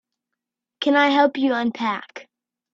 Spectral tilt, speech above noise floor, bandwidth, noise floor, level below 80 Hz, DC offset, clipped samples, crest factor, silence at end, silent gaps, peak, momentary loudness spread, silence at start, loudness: -4.5 dB/octave; 65 dB; 7.4 kHz; -84 dBFS; -72 dBFS; under 0.1%; under 0.1%; 20 dB; 0.5 s; none; -4 dBFS; 12 LU; 0.8 s; -20 LUFS